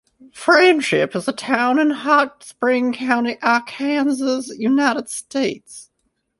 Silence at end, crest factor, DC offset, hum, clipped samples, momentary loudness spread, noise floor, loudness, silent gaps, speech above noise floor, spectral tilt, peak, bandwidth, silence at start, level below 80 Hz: 0.55 s; 18 dB; under 0.1%; none; under 0.1%; 10 LU; -70 dBFS; -18 LUFS; none; 52 dB; -4 dB/octave; 0 dBFS; 11.5 kHz; 0.35 s; -66 dBFS